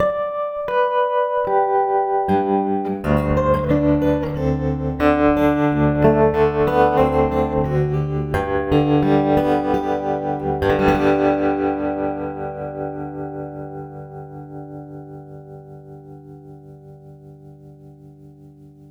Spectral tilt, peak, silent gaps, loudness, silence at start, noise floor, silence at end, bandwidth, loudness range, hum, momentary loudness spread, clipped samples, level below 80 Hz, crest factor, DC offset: -8.5 dB/octave; -2 dBFS; none; -19 LUFS; 0 s; -44 dBFS; 0.2 s; 12 kHz; 18 LU; none; 19 LU; under 0.1%; -36 dBFS; 18 dB; under 0.1%